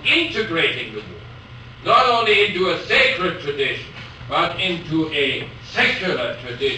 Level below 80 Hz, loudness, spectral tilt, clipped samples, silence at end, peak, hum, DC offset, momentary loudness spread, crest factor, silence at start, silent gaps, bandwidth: -48 dBFS; -19 LUFS; -4.5 dB/octave; under 0.1%; 0 s; -4 dBFS; none; under 0.1%; 20 LU; 16 dB; 0 s; none; 9.4 kHz